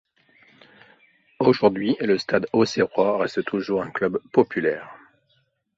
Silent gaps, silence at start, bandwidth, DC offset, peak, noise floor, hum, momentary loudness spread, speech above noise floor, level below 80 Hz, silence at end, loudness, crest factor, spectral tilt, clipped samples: none; 1.4 s; 7.8 kHz; under 0.1%; -2 dBFS; -67 dBFS; none; 6 LU; 46 dB; -62 dBFS; 0.8 s; -22 LUFS; 20 dB; -6 dB/octave; under 0.1%